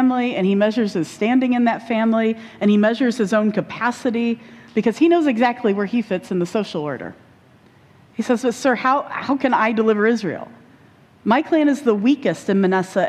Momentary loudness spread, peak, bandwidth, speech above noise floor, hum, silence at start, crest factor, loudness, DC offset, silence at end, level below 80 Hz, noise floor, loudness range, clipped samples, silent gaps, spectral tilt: 9 LU; -4 dBFS; 12.5 kHz; 32 dB; none; 0 s; 14 dB; -19 LUFS; under 0.1%; 0 s; -64 dBFS; -51 dBFS; 4 LU; under 0.1%; none; -6.5 dB/octave